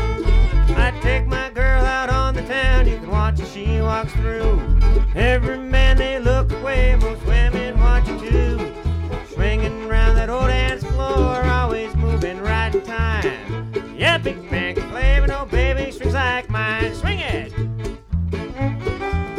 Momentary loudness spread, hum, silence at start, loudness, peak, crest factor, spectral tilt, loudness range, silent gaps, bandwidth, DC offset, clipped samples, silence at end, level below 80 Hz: 7 LU; none; 0 s; -20 LUFS; -6 dBFS; 12 dB; -6.5 dB/octave; 2 LU; none; 9.6 kHz; under 0.1%; under 0.1%; 0 s; -20 dBFS